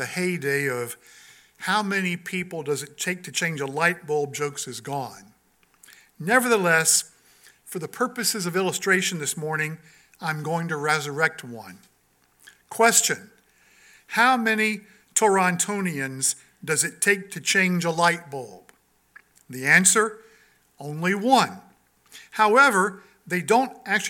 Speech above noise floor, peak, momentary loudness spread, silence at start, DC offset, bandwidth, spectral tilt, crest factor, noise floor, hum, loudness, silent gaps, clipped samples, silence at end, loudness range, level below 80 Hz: 41 dB; -2 dBFS; 16 LU; 0 s; under 0.1%; 17.5 kHz; -3 dB/octave; 22 dB; -64 dBFS; none; -22 LUFS; none; under 0.1%; 0 s; 5 LU; -74 dBFS